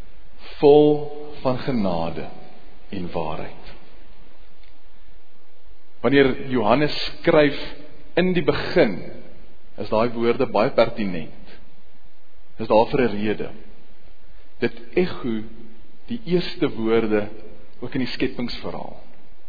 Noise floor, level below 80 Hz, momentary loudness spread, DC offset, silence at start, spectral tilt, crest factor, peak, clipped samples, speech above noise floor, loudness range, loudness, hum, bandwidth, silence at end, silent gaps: -54 dBFS; -44 dBFS; 18 LU; 6%; 0.2 s; -8 dB/octave; 22 dB; -2 dBFS; under 0.1%; 33 dB; 8 LU; -22 LUFS; none; 5 kHz; 0.25 s; none